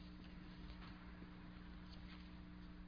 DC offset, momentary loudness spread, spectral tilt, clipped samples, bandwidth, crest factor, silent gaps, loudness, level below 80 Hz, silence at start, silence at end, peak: under 0.1%; 1 LU; -5 dB/octave; under 0.1%; 5.2 kHz; 12 dB; none; -57 LUFS; -60 dBFS; 0 s; 0 s; -42 dBFS